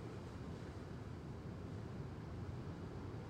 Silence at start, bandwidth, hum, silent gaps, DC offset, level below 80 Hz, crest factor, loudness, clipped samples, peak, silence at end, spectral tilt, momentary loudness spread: 0 s; 13 kHz; none; none; under 0.1%; -60 dBFS; 12 dB; -50 LUFS; under 0.1%; -36 dBFS; 0 s; -7.5 dB/octave; 2 LU